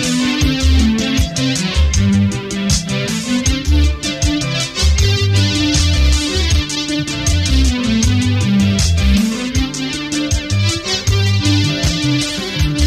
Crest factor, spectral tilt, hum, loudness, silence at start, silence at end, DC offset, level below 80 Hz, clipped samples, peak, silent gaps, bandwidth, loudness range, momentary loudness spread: 12 dB; -4.5 dB/octave; none; -15 LUFS; 0 s; 0 s; under 0.1%; -20 dBFS; under 0.1%; -2 dBFS; none; 15.5 kHz; 1 LU; 5 LU